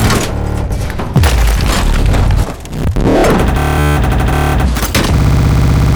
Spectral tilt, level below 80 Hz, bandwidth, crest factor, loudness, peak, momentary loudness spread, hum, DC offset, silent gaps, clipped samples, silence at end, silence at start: -5.5 dB/octave; -14 dBFS; over 20 kHz; 10 dB; -13 LUFS; 0 dBFS; 7 LU; none; under 0.1%; none; under 0.1%; 0 s; 0 s